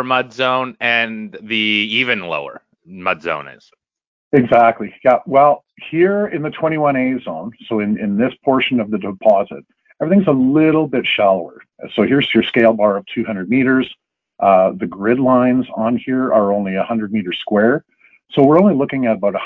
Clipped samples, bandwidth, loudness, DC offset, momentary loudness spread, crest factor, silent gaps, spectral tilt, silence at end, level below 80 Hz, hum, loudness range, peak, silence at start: under 0.1%; 6.4 kHz; -16 LUFS; under 0.1%; 11 LU; 16 dB; 4.07-4.31 s; -8 dB/octave; 0 s; -56 dBFS; none; 3 LU; 0 dBFS; 0 s